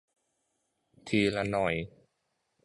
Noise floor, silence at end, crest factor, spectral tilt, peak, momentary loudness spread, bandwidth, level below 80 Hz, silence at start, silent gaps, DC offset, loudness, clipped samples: -79 dBFS; 0.8 s; 20 dB; -6 dB/octave; -14 dBFS; 17 LU; 11.5 kHz; -58 dBFS; 1.05 s; none; under 0.1%; -30 LUFS; under 0.1%